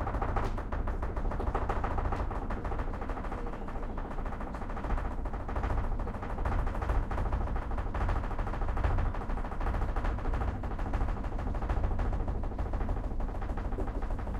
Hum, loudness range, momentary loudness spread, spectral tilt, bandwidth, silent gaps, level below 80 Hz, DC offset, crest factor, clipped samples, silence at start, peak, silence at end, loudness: none; 3 LU; 5 LU; -8 dB/octave; 7 kHz; none; -34 dBFS; under 0.1%; 16 dB; under 0.1%; 0 s; -16 dBFS; 0 s; -36 LUFS